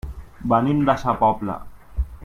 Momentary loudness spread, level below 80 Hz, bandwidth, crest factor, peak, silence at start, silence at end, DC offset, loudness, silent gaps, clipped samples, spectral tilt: 16 LU; -34 dBFS; 13.5 kHz; 18 dB; -4 dBFS; 0.05 s; 0 s; under 0.1%; -21 LUFS; none; under 0.1%; -8 dB/octave